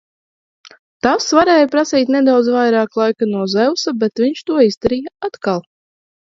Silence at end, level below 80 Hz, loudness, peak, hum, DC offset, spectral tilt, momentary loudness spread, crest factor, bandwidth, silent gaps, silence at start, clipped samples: 0.75 s; -52 dBFS; -15 LUFS; 0 dBFS; none; under 0.1%; -4.5 dB/octave; 9 LU; 16 dB; 7.8 kHz; 0.79-1.00 s, 4.77-4.81 s; 0.65 s; under 0.1%